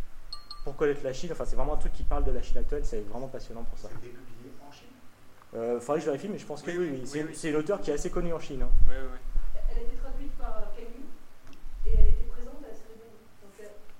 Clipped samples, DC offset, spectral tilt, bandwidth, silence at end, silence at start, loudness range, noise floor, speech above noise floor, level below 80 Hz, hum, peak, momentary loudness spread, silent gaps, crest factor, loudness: under 0.1%; under 0.1%; -6 dB/octave; 9.2 kHz; 0 s; 0 s; 6 LU; -49 dBFS; 26 dB; -30 dBFS; none; -4 dBFS; 20 LU; none; 20 dB; -34 LUFS